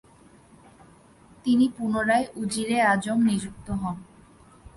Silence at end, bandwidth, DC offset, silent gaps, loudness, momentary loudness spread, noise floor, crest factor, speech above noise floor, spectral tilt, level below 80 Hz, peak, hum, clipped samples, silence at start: 0.75 s; 11.5 kHz; under 0.1%; none; -25 LUFS; 11 LU; -54 dBFS; 16 dB; 30 dB; -5 dB/octave; -54 dBFS; -10 dBFS; none; under 0.1%; 1.45 s